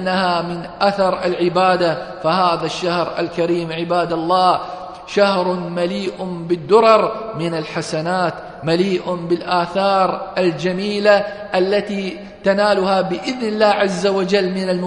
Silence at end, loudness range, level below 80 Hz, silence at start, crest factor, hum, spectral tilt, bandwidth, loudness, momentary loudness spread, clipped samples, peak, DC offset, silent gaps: 0 s; 2 LU; -54 dBFS; 0 s; 18 dB; none; -5.5 dB/octave; 10.5 kHz; -18 LUFS; 8 LU; under 0.1%; 0 dBFS; under 0.1%; none